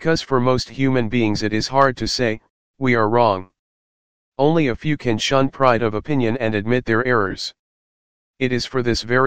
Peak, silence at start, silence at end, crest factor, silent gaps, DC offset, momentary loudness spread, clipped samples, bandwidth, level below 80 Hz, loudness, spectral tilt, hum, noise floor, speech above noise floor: 0 dBFS; 0 s; 0 s; 18 dB; 2.50-2.74 s, 3.59-4.32 s, 7.59-8.34 s; 2%; 7 LU; under 0.1%; 9.6 kHz; -44 dBFS; -19 LUFS; -5.5 dB/octave; none; under -90 dBFS; over 72 dB